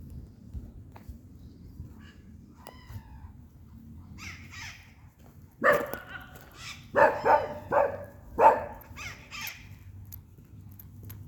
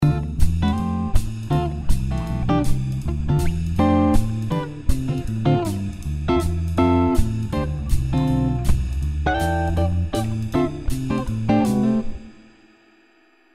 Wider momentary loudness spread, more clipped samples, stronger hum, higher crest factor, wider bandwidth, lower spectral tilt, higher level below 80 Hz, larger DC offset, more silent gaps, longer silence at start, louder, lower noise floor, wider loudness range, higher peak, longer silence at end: first, 26 LU vs 7 LU; neither; neither; first, 26 dB vs 18 dB; first, over 20 kHz vs 15 kHz; second, -5 dB/octave vs -7.5 dB/octave; second, -54 dBFS vs -26 dBFS; second, under 0.1% vs 0.3%; neither; about the same, 0 s vs 0 s; second, -27 LUFS vs -22 LUFS; second, -53 dBFS vs -57 dBFS; first, 21 LU vs 2 LU; second, -6 dBFS vs -2 dBFS; second, 0 s vs 1.05 s